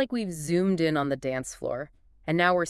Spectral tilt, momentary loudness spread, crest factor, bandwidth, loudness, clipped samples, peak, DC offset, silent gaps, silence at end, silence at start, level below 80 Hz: -5.5 dB/octave; 12 LU; 18 dB; 12 kHz; -28 LUFS; under 0.1%; -8 dBFS; under 0.1%; none; 0 s; 0 s; -58 dBFS